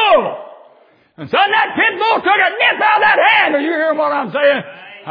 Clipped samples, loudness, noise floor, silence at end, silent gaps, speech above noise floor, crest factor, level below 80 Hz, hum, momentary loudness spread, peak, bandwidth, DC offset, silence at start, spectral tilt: under 0.1%; -13 LUFS; -50 dBFS; 0 s; none; 36 dB; 14 dB; -64 dBFS; none; 10 LU; 0 dBFS; 5.2 kHz; under 0.1%; 0 s; -6 dB/octave